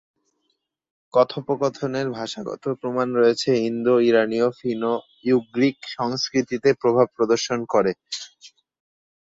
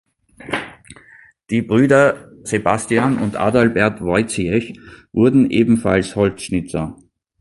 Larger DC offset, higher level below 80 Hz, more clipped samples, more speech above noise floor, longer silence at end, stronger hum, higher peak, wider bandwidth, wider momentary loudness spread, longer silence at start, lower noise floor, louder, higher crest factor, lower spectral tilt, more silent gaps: neither; second, -66 dBFS vs -44 dBFS; neither; first, 53 dB vs 31 dB; first, 0.9 s vs 0.45 s; neither; second, -4 dBFS vs 0 dBFS; second, 7.8 kHz vs 11.5 kHz; second, 9 LU vs 12 LU; first, 1.15 s vs 0.4 s; first, -74 dBFS vs -47 dBFS; second, -22 LUFS vs -17 LUFS; about the same, 18 dB vs 18 dB; about the same, -5 dB/octave vs -6 dB/octave; neither